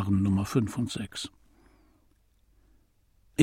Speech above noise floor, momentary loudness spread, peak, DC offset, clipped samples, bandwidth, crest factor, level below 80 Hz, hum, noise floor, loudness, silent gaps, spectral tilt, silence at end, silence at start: 37 dB; 12 LU; -6 dBFS; under 0.1%; under 0.1%; 15.5 kHz; 24 dB; -56 dBFS; none; -65 dBFS; -30 LUFS; none; -6 dB/octave; 0 s; 0 s